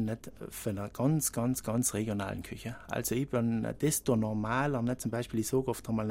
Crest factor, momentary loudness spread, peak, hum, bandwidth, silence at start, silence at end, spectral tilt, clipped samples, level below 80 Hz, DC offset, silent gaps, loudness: 16 dB; 9 LU; -16 dBFS; none; 16.5 kHz; 0 s; 0 s; -5.5 dB/octave; under 0.1%; -56 dBFS; under 0.1%; none; -32 LUFS